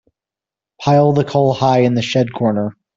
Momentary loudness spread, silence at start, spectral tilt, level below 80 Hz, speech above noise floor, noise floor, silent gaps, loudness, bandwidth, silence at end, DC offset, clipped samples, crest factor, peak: 5 LU; 0.8 s; -7 dB/octave; -54 dBFS; 74 dB; -88 dBFS; none; -15 LUFS; 7.6 kHz; 0.25 s; under 0.1%; under 0.1%; 14 dB; -2 dBFS